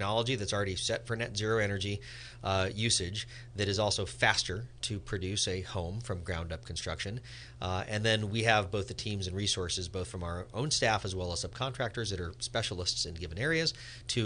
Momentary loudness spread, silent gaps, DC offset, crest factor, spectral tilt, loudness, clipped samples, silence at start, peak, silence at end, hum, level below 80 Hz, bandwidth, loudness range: 10 LU; none; under 0.1%; 24 dB; -3.5 dB/octave; -33 LUFS; under 0.1%; 0 s; -10 dBFS; 0 s; none; -48 dBFS; 10 kHz; 3 LU